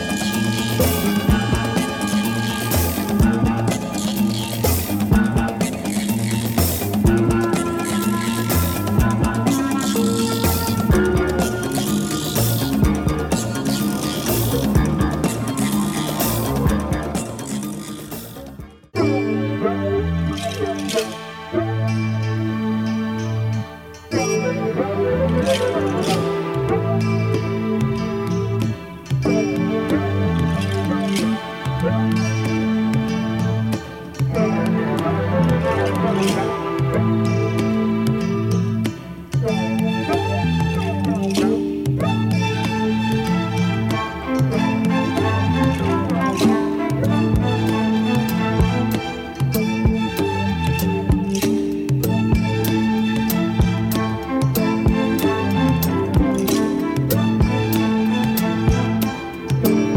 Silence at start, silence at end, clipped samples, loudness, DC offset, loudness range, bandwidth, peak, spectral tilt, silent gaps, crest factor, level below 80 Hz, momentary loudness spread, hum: 0 s; 0 s; under 0.1%; -20 LUFS; under 0.1%; 3 LU; 19 kHz; -4 dBFS; -6 dB/octave; none; 16 dB; -32 dBFS; 5 LU; none